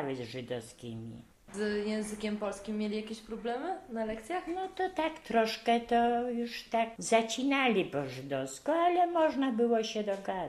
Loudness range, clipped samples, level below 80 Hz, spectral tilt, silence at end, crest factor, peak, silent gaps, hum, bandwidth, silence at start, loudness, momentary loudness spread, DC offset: 7 LU; under 0.1%; -64 dBFS; -4.5 dB/octave; 0 s; 20 dB; -12 dBFS; none; none; 14.5 kHz; 0 s; -32 LUFS; 12 LU; under 0.1%